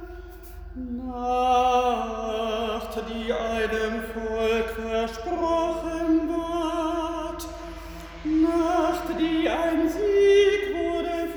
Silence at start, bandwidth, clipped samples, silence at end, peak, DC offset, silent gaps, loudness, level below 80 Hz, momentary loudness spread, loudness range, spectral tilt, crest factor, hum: 0 s; over 20 kHz; under 0.1%; 0 s; -10 dBFS; under 0.1%; none; -25 LUFS; -42 dBFS; 15 LU; 5 LU; -5 dB/octave; 16 dB; none